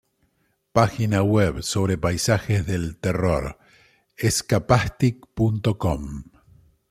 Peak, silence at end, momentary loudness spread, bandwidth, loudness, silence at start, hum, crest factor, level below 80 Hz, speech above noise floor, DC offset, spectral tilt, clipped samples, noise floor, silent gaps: -2 dBFS; 0.7 s; 7 LU; 15.5 kHz; -22 LUFS; 0.75 s; none; 20 dB; -42 dBFS; 47 dB; under 0.1%; -5.5 dB/octave; under 0.1%; -69 dBFS; none